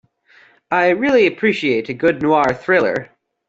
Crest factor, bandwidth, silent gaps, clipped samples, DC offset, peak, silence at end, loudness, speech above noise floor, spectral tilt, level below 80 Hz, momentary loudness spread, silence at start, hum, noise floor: 14 dB; 7.8 kHz; none; under 0.1%; under 0.1%; -2 dBFS; 0.45 s; -16 LUFS; 35 dB; -6 dB/octave; -56 dBFS; 6 LU; 0.7 s; none; -51 dBFS